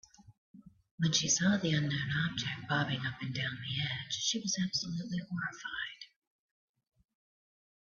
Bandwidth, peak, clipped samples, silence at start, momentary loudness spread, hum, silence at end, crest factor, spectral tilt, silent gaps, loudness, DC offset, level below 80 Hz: 7.6 kHz; -14 dBFS; under 0.1%; 0.3 s; 11 LU; none; 1.85 s; 22 dB; -3 dB/octave; 0.38-0.54 s, 0.91-0.98 s; -33 LUFS; under 0.1%; -66 dBFS